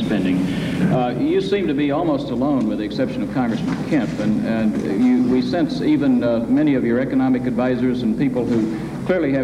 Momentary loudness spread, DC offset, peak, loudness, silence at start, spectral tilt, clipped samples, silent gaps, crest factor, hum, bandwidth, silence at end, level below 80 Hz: 5 LU; under 0.1%; -6 dBFS; -19 LUFS; 0 s; -7.5 dB/octave; under 0.1%; none; 12 dB; none; 11 kHz; 0 s; -46 dBFS